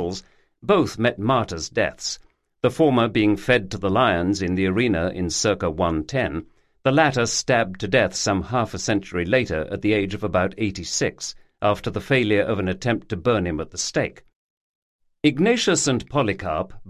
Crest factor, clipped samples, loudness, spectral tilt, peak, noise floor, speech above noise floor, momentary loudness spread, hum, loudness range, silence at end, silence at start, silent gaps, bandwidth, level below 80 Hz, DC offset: 18 dB; under 0.1%; -22 LUFS; -4.5 dB/octave; -4 dBFS; -41 dBFS; 20 dB; 7 LU; none; 3 LU; 0 s; 0 s; 14.36-14.99 s; 13 kHz; -44 dBFS; under 0.1%